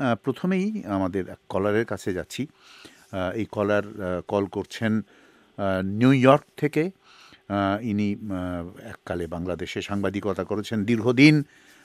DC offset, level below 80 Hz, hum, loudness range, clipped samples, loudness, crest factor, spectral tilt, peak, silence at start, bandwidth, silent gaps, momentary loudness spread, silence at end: under 0.1%; -58 dBFS; none; 5 LU; under 0.1%; -25 LUFS; 22 dB; -7 dB/octave; -2 dBFS; 0 s; 14.5 kHz; none; 14 LU; 0.4 s